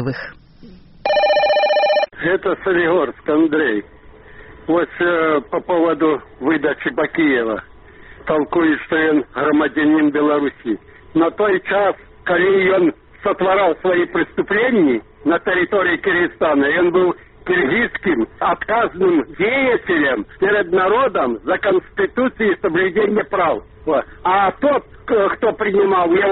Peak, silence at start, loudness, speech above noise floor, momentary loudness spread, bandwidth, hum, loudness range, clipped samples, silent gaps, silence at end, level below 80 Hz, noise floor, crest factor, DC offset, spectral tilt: -4 dBFS; 0 s; -17 LUFS; 25 dB; 6 LU; 5.8 kHz; none; 2 LU; under 0.1%; none; 0 s; -48 dBFS; -42 dBFS; 12 dB; under 0.1%; -3.5 dB/octave